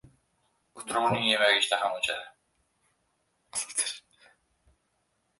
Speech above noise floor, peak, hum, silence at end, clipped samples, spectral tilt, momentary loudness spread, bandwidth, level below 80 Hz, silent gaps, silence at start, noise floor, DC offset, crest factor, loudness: 48 dB; -10 dBFS; none; 1.4 s; under 0.1%; -1.5 dB/octave; 14 LU; 12 kHz; -70 dBFS; none; 0.75 s; -75 dBFS; under 0.1%; 22 dB; -27 LUFS